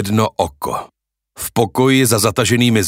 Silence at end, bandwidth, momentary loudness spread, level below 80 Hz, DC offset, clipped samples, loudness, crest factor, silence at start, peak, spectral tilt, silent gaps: 0 s; 16.5 kHz; 11 LU; -46 dBFS; under 0.1%; under 0.1%; -15 LUFS; 16 dB; 0 s; 0 dBFS; -4.5 dB/octave; none